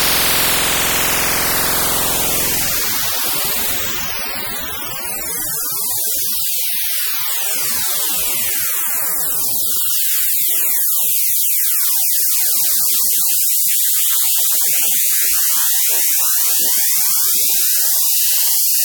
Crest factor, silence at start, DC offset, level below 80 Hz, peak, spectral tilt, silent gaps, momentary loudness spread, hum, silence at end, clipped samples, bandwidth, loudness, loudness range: 14 dB; 0 s; under 0.1%; -44 dBFS; -2 dBFS; 0.5 dB/octave; none; 5 LU; none; 0 s; under 0.1%; 19.5 kHz; -13 LUFS; 5 LU